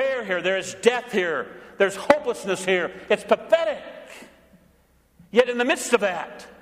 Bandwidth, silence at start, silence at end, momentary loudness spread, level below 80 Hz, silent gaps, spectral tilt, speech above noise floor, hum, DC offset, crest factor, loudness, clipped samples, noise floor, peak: 15.5 kHz; 0 s; 0.1 s; 13 LU; -62 dBFS; none; -3.5 dB/octave; 37 dB; none; under 0.1%; 24 dB; -23 LUFS; under 0.1%; -60 dBFS; 0 dBFS